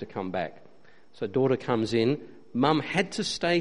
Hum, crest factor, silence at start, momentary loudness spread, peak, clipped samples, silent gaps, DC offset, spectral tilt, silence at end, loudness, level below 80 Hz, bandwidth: none; 20 dB; 0 s; 10 LU; -8 dBFS; under 0.1%; none; 0.3%; -5.5 dB/octave; 0 s; -28 LUFS; -62 dBFS; 10.5 kHz